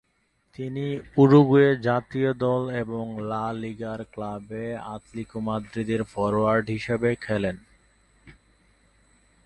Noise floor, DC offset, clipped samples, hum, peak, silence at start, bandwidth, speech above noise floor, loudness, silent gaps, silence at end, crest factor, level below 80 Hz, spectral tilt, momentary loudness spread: -70 dBFS; under 0.1%; under 0.1%; none; -4 dBFS; 0.6 s; 9.8 kHz; 46 dB; -24 LUFS; none; 1.15 s; 20 dB; -54 dBFS; -8 dB/octave; 16 LU